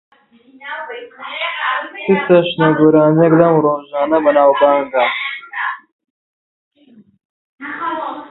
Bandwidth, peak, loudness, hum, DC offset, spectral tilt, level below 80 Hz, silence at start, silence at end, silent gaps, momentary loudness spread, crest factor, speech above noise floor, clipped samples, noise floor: 4.1 kHz; 0 dBFS; -14 LUFS; none; under 0.1%; -10.5 dB/octave; -58 dBFS; 0.6 s; 0.05 s; 5.92-5.99 s, 6.10-6.71 s, 7.25-7.58 s; 18 LU; 16 dB; 35 dB; under 0.1%; -48 dBFS